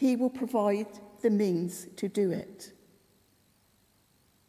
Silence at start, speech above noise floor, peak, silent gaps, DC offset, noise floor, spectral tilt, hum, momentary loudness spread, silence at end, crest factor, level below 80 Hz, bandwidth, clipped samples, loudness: 0 s; 38 dB; -14 dBFS; none; under 0.1%; -67 dBFS; -6.5 dB/octave; none; 16 LU; 1.8 s; 16 dB; -74 dBFS; 15.5 kHz; under 0.1%; -30 LUFS